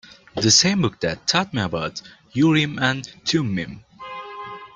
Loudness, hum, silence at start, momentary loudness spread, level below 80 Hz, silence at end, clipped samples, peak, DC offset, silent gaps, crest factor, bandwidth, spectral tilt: -20 LUFS; none; 0.1 s; 20 LU; -54 dBFS; 0.1 s; under 0.1%; -2 dBFS; under 0.1%; none; 20 dB; 10 kHz; -3.5 dB/octave